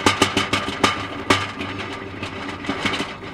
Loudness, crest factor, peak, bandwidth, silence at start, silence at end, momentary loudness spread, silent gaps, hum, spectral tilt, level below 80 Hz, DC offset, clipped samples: -22 LUFS; 24 dB; 0 dBFS; 16.5 kHz; 0 s; 0 s; 11 LU; none; none; -3.5 dB/octave; -48 dBFS; under 0.1%; under 0.1%